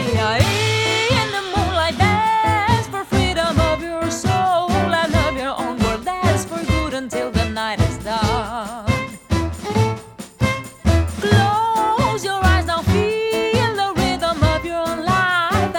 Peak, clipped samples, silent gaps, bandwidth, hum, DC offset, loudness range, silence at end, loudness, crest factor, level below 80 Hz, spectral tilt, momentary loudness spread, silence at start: -2 dBFS; under 0.1%; none; 18 kHz; none; under 0.1%; 4 LU; 0 s; -19 LUFS; 18 dB; -30 dBFS; -5 dB/octave; 6 LU; 0 s